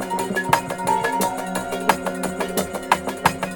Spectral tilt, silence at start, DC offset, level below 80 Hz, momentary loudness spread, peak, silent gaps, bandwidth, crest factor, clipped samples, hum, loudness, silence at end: -4 dB/octave; 0 s; under 0.1%; -50 dBFS; 5 LU; -2 dBFS; none; 19.5 kHz; 20 dB; under 0.1%; none; -22 LUFS; 0 s